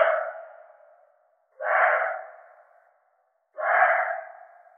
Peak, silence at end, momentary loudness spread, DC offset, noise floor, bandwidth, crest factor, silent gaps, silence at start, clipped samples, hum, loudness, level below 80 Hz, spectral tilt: -6 dBFS; 0.5 s; 25 LU; under 0.1%; -70 dBFS; 3.6 kHz; 20 dB; none; 0 s; under 0.1%; none; -24 LUFS; under -90 dBFS; 15.5 dB/octave